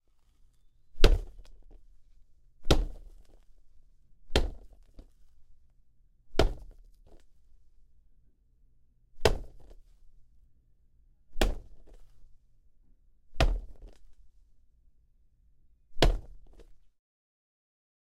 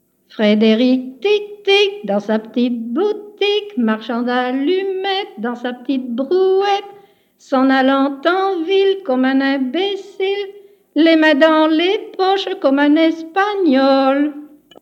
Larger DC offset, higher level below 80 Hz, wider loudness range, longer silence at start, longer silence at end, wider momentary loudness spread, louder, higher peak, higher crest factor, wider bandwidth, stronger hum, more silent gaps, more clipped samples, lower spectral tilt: neither; first, -36 dBFS vs -76 dBFS; about the same, 6 LU vs 4 LU; first, 0.95 s vs 0.4 s; first, 1.25 s vs 0.35 s; first, 24 LU vs 9 LU; second, -31 LUFS vs -16 LUFS; about the same, -4 dBFS vs -2 dBFS; first, 30 dB vs 14 dB; first, 15.5 kHz vs 7.8 kHz; neither; neither; neither; about the same, -5 dB/octave vs -5.5 dB/octave